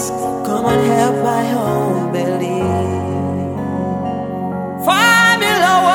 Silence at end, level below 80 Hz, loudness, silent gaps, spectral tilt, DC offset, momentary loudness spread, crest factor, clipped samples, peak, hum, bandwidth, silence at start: 0 s; -48 dBFS; -15 LUFS; none; -4.5 dB/octave; under 0.1%; 11 LU; 16 dB; under 0.1%; 0 dBFS; none; 18 kHz; 0 s